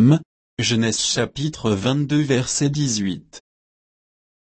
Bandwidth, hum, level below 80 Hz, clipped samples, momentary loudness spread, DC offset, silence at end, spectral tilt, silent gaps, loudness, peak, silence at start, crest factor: 8.8 kHz; none; -52 dBFS; under 0.1%; 6 LU; under 0.1%; 1.2 s; -4.5 dB/octave; 0.25-0.57 s; -20 LUFS; -4 dBFS; 0 s; 18 dB